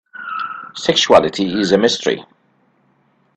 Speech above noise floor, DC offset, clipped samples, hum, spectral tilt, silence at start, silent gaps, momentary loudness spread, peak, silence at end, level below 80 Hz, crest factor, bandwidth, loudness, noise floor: 44 dB; under 0.1%; under 0.1%; none; -3.5 dB/octave; 0.15 s; none; 14 LU; 0 dBFS; 1.15 s; -54 dBFS; 18 dB; 9 kHz; -16 LUFS; -59 dBFS